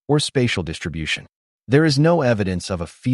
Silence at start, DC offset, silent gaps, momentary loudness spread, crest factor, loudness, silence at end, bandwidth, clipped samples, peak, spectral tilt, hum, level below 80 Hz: 0.1 s; under 0.1%; 1.36-1.59 s; 10 LU; 16 dB; -20 LUFS; 0 s; 11.5 kHz; under 0.1%; -4 dBFS; -5.5 dB/octave; none; -44 dBFS